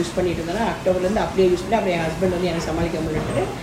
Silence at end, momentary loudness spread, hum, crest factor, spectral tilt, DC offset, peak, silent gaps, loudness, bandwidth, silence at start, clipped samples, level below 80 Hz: 0 s; 5 LU; none; 16 dB; -6 dB/octave; under 0.1%; -6 dBFS; none; -22 LUFS; 15.5 kHz; 0 s; under 0.1%; -38 dBFS